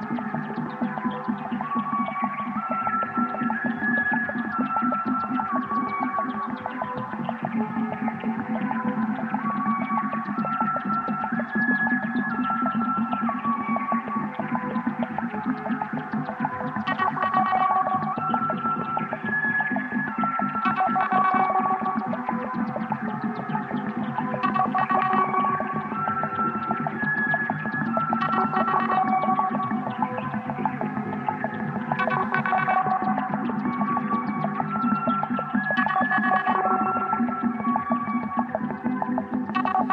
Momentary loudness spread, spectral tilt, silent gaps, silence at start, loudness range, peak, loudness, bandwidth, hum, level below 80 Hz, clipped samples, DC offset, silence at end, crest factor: 7 LU; -8.5 dB/octave; none; 0 s; 4 LU; -6 dBFS; -25 LUFS; 5.4 kHz; none; -64 dBFS; under 0.1%; under 0.1%; 0 s; 18 dB